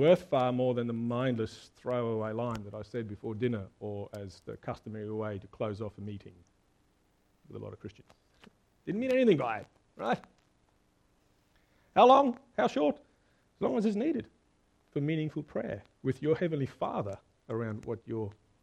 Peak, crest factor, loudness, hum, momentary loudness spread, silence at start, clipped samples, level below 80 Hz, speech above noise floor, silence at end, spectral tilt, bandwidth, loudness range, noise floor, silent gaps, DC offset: -8 dBFS; 24 dB; -32 LUFS; none; 18 LU; 0 s; under 0.1%; -66 dBFS; 39 dB; 0.3 s; -7.5 dB/octave; 11 kHz; 13 LU; -70 dBFS; none; under 0.1%